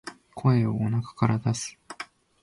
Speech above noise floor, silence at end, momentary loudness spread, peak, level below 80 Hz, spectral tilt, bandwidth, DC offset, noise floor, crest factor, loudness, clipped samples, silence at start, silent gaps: 20 dB; 0.4 s; 17 LU; -10 dBFS; -56 dBFS; -6.5 dB/octave; 11.5 kHz; under 0.1%; -44 dBFS; 18 dB; -26 LUFS; under 0.1%; 0.05 s; none